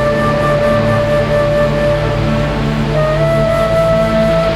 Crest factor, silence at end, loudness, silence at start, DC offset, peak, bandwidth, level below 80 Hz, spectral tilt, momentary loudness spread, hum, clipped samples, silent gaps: 10 dB; 0 s; -13 LUFS; 0 s; under 0.1%; -2 dBFS; 13.5 kHz; -26 dBFS; -7 dB/octave; 3 LU; none; under 0.1%; none